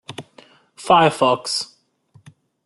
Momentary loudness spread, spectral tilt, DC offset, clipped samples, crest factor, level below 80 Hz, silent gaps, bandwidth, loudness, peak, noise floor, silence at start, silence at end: 22 LU; -4 dB/octave; under 0.1%; under 0.1%; 20 dB; -64 dBFS; none; 12 kHz; -17 LUFS; -2 dBFS; -55 dBFS; 0.1 s; 1 s